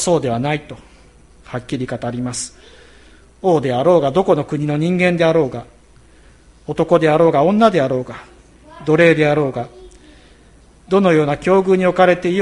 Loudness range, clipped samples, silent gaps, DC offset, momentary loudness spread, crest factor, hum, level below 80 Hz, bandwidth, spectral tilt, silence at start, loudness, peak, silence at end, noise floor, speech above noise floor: 6 LU; under 0.1%; none; under 0.1%; 15 LU; 16 dB; none; -48 dBFS; 11.5 kHz; -6 dB/octave; 0 s; -16 LUFS; 0 dBFS; 0 s; -47 dBFS; 32 dB